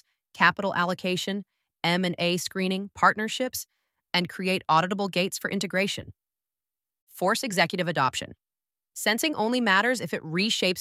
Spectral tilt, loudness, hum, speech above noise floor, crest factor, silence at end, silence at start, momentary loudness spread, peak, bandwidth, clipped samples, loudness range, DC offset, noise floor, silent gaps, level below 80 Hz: -3.5 dB/octave; -26 LUFS; none; over 64 dB; 24 dB; 0 s; 0.35 s; 8 LU; -4 dBFS; 16 kHz; under 0.1%; 3 LU; under 0.1%; under -90 dBFS; 7.02-7.07 s; -68 dBFS